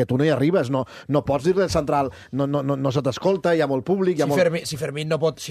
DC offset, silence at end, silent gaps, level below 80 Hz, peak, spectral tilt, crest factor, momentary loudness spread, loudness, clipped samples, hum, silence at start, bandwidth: under 0.1%; 0 s; none; -50 dBFS; -6 dBFS; -6.5 dB/octave; 16 dB; 7 LU; -22 LUFS; under 0.1%; none; 0 s; 14 kHz